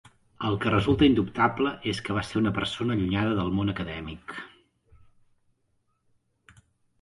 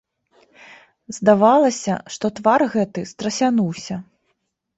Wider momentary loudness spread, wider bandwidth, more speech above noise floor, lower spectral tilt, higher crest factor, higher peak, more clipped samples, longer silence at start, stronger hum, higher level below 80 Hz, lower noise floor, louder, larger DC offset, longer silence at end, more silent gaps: about the same, 16 LU vs 15 LU; first, 11.5 kHz vs 8.2 kHz; second, 46 dB vs 53 dB; about the same, -6.5 dB/octave vs -5.5 dB/octave; about the same, 20 dB vs 18 dB; second, -8 dBFS vs -2 dBFS; neither; second, 0.4 s vs 1.1 s; neither; first, -48 dBFS vs -62 dBFS; about the same, -72 dBFS vs -72 dBFS; second, -26 LUFS vs -19 LUFS; neither; first, 2.55 s vs 0.75 s; neither